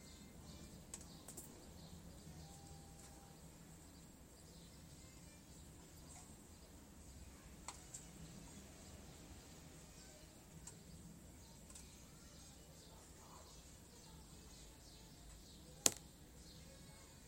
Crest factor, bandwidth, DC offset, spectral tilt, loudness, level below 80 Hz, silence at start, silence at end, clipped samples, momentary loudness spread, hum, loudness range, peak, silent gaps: 48 dB; 16 kHz; under 0.1%; -2.5 dB/octave; -53 LUFS; -66 dBFS; 0 s; 0 s; under 0.1%; 5 LU; none; 13 LU; -8 dBFS; none